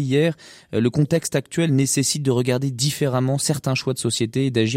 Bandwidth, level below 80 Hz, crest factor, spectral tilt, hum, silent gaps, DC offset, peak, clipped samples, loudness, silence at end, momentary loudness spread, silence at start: 16 kHz; -56 dBFS; 16 dB; -5 dB/octave; none; none; under 0.1%; -6 dBFS; under 0.1%; -21 LUFS; 0 s; 4 LU; 0 s